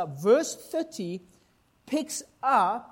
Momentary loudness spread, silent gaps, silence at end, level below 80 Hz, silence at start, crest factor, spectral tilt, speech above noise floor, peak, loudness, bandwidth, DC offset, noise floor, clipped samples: 13 LU; none; 0.05 s; -72 dBFS; 0 s; 18 dB; -4.5 dB/octave; 38 dB; -10 dBFS; -27 LUFS; 16.5 kHz; under 0.1%; -65 dBFS; under 0.1%